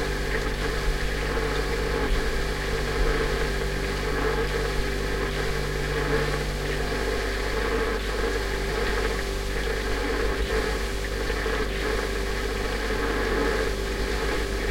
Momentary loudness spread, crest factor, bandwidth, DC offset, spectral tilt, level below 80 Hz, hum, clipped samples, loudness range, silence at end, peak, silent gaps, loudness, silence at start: 3 LU; 14 dB; 16.5 kHz; under 0.1%; -4.5 dB/octave; -30 dBFS; 50 Hz at -30 dBFS; under 0.1%; 1 LU; 0 s; -12 dBFS; none; -27 LUFS; 0 s